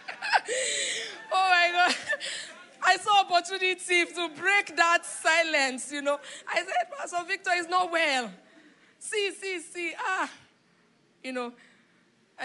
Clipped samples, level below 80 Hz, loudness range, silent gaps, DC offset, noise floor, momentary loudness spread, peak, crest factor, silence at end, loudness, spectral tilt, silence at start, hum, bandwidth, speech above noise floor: under 0.1%; -88 dBFS; 9 LU; none; under 0.1%; -65 dBFS; 12 LU; -8 dBFS; 20 dB; 0 s; -26 LUFS; 0 dB/octave; 0 s; none; 11.5 kHz; 36 dB